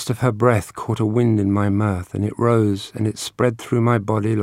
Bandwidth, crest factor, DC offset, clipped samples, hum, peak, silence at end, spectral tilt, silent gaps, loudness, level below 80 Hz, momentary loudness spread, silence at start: 15 kHz; 18 dB; under 0.1%; under 0.1%; none; 0 dBFS; 0 s; -7 dB/octave; none; -20 LUFS; -52 dBFS; 6 LU; 0 s